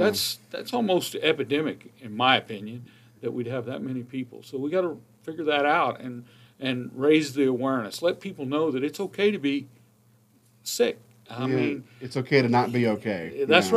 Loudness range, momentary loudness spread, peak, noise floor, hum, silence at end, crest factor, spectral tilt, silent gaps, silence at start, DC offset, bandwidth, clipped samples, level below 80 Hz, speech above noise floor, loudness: 3 LU; 15 LU; -2 dBFS; -60 dBFS; none; 0 s; 24 dB; -4.5 dB/octave; none; 0 s; under 0.1%; 15.5 kHz; under 0.1%; -74 dBFS; 35 dB; -26 LUFS